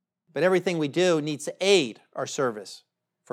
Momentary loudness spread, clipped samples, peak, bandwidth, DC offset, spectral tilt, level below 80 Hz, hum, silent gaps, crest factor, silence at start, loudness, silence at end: 14 LU; under 0.1%; -6 dBFS; 14 kHz; under 0.1%; -4 dB/octave; under -90 dBFS; none; none; 20 dB; 0.35 s; -25 LUFS; 0.55 s